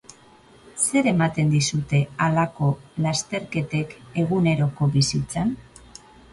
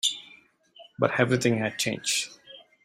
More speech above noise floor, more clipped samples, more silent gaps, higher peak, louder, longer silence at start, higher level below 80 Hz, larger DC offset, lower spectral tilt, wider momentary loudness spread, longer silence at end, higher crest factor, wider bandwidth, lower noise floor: about the same, 29 dB vs 30 dB; neither; neither; about the same, -8 dBFS vs -6 dBFS; first, -23 LUFS vs -26 LUFS; first, 0.75 s vs 0.05 s; first, -52 dBFS vs -64 dBFS; neither; first, -5 dB/octave vs -3.5 dB/octave; second, 7 LU vs 14 LU; first, 0.7 s vs 0.25 s; second, 16 dB vs 22 dB; second, 11.5 kHz vs 16 kHz; second, -51 dBFS vs -56 dBFS